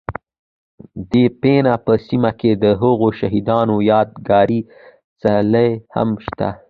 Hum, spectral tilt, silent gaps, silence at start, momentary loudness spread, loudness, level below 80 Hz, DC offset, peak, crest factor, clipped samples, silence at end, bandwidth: none; -9.5 dB/octave; 0.39-0.78 s, 5.04-5.16 s; 0.1 s; 9 LU; -16 LUFS; -46 dBFS; under 0.1%; -2 dBFS; 16 dB; under 0.1%; 0.15 s; 5.2 kHz